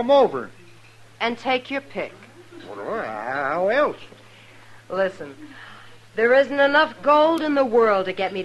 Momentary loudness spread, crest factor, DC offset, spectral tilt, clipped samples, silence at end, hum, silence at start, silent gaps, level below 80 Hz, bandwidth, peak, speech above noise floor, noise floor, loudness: 21 LU; 16 dB; under 0.1%; -5 dB/octave; under 0.1%; 0 s; none; 0 s; none; -64 dBFS; 12 kHz; -6 dBFS; 27 dB; -47 dBFS; -21 LUFS